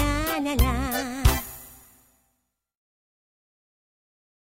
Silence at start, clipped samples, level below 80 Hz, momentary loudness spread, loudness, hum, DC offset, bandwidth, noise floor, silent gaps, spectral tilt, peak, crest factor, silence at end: 0 s; under 0.1%; -32 dBFS; 16 LU; -25 LUFS; none; under 0.1%; 16.5 kHz; -75 dBFS; none; -5 dB/octave; -6 dBFS; 22 dB; 2.8 s